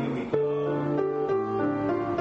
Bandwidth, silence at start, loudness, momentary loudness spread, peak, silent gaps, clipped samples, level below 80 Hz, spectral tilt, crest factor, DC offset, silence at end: 7.2 kHz; 0 s; -27 LUFS; 1 LU; -12 dBFS; none; under 0.1%; -60 dBFS; -9 dB/octave; 14 dB; under 0.1%; 0 s